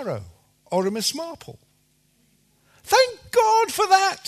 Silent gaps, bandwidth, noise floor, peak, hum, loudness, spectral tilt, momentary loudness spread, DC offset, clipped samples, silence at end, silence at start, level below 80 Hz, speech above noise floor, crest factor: none; 13.5 kHz; -64 dBFS; -2 dBFS; none; -21 LUFS; -2.5 dB/octave; 16 LU; under 0.1%; under 0.1%; 0 s; 0 s; -62 dBFS; 43 dB; 20 dB